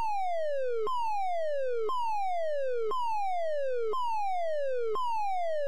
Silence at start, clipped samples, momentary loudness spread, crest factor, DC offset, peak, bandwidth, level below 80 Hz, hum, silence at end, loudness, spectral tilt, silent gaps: 0 s; under 0.1%; 0 LU; 6 dB; 2%; -22 dBFS; 15.5 kHz; -72 dBFS; none; 0 s; -32 LUFS; -3.5 dB/octave; none